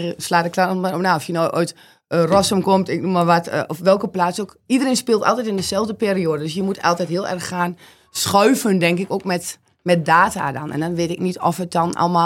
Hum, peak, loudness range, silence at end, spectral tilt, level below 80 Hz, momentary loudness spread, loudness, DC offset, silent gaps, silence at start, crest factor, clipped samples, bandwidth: none; 0 dBFS; 2 LU; 0 s; -5 dB/octave; -56 dBFS; 9 LU; -19 LUFS; under 0.1%; none; 0 s; 18 dB; under 0.1%; 16.5 kHz